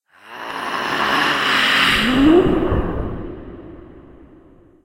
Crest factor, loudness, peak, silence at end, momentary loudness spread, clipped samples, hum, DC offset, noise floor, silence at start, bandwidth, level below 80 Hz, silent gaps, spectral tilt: 16 dB; -16 LUFS; -2 dBFS; 0.85 s; 21 LU; under 0.1%; none; under 0.1%; -48 dBFS; 0.25 s; 16 kHz; -34 dBFS; none; -4.5 dB/octave